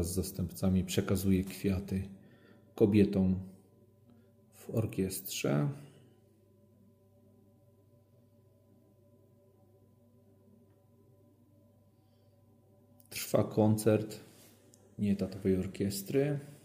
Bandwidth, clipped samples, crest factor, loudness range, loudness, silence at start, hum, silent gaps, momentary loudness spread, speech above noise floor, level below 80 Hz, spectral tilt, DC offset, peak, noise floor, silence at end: 16 kHz; under 0.1%; 22 dB; 8 LU; -32 LUFS; 0 s; none; none; 17 LU; 34 dB; -60 dBFS; -6.5 dB/octave; under 0.1%; -12 dBFS; -65 dBFS; 0.1 s